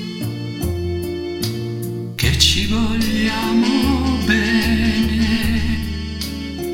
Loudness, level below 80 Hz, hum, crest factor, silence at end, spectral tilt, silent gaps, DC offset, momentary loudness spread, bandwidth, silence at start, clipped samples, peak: -19 LUFS; -28 dBFS; none; 18 dB; 0 s; -4.5 dB/octave; none; under 0.1%; 11 LU; 17 kHz; 0 s; under 0.1%; 0 dBFS